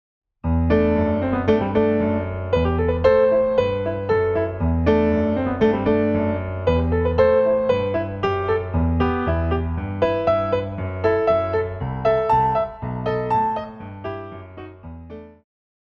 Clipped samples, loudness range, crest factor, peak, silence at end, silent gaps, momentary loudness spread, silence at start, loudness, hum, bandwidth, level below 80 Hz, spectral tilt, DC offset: under 0.1%; 4 LU; 16 dB; -4 dBFS; 0.65 s; none; 14 LU; 0.45 s; -20 LUFS; none; 6.6 kHz; -34 dBFS; -9 dB/octave; under 0.1%